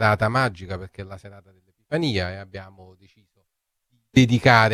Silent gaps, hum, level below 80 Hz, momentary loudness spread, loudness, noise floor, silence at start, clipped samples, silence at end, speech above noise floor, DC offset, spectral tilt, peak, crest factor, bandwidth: none; none; -50 dBFS; 23 LU; -20 LUFS; -77 dBFS; 0 s; under 0.1%; 0 s; 55 dB; under 0.1%; -6 dB/octave; -2 dBFS; 22 dB; 13 kHz